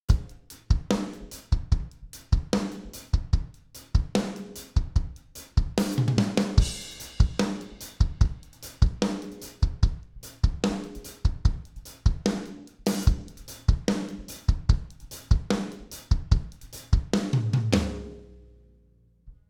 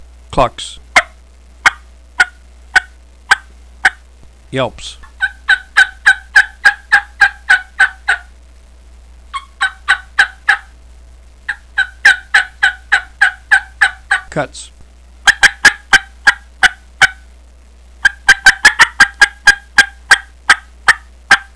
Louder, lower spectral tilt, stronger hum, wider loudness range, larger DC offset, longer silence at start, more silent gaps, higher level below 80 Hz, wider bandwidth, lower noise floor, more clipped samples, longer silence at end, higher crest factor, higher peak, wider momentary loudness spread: second, -28 LUFS vs -12 LUFS; first, -6 dB/octave vs -0.5 dB/octave; neither; second, 3 LU vs 7 LU; second, under 0.1% vs 0.3%; second, 0.1 s vs 0.3 s; neither; first, -30 dBFS vs -38 dBFS; first, 18 kHz vs 11 kHz; first, -60 dBFS vs -41 dBFS; second, under 0.1% vs 0.9%; about the same, 0.15 s vs 0.15 s; first, 22 dB vs 14 dB; second, -4 dBFS vs 0 dBFS; first, 17 LU vs 12 LU